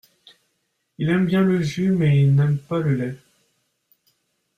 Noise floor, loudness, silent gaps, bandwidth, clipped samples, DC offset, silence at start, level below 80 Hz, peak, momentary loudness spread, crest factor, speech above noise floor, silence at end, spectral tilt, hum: -73 dBFS; -20 LUFS; none; 8.2 kHz; under 0.1%; under 0.1%; 1 s; -56 dBFS; -8 dBFS; 10 LU; 14 dB; 54 dB; 1.4 s; -8 dB/octave; none